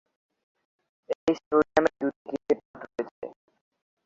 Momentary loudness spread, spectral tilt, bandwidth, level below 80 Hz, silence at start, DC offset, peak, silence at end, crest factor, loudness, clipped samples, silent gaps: 15 LU; -6 dB/octave; 7.6 kHz; -64 dBFS; 1.1 s; under 0.1%; -6 dBFS; 0.75 s; 22 dB; -28 LUFS; under 0.1%; 1.15-1.27 s, 1.46-1.51 s, 2.16-2.25 s, 2.65-2.74 s, 3.11-3.22 s